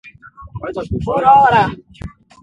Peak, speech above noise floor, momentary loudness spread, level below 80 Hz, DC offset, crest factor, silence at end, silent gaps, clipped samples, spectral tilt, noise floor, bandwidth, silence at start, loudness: 0 dBFS; 25 dB; 25 LU; -38 dBFS; under 0.1%; 16 dB; 0.35 s; none; under 0.1%; -7 dB/octave; -39 dBFS; 7.8 kHz; 0.05 s; -13 LUFS